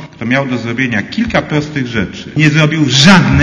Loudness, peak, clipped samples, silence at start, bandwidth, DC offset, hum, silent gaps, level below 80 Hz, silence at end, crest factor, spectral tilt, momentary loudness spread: -11 LUFS; 0 dBFS; 0.9%; 0 s; 11 kHz; under 0.1%; none; none; -34 dBFS; 0 s; 12 dB; -5 dB/octave; 11 LU